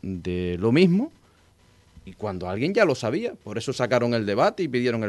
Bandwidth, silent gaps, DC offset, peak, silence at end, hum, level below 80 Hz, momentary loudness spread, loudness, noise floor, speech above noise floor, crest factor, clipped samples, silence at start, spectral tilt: 12 kHz; none; under 0.1%; -6 dBFS; 0 s; none; -50 dBFS; 12 LU; -24 LUFS; -58 dBFS; 34 dB; 18 dB; under 0.1%; 0.05 s; -6.5 dB/octave